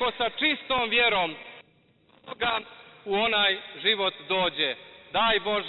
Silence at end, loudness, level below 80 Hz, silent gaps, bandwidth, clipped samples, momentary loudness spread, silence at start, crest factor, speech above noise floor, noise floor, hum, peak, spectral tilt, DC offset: 0 s; -25 LUFS; -58 dBFS; none; 4.9 kHz; under 0.1%; 13 LU; 0 s; 18 dB; 36 dB; -62 dBFS; none; -10 dBFS; -7 dB/octave; under 0.1%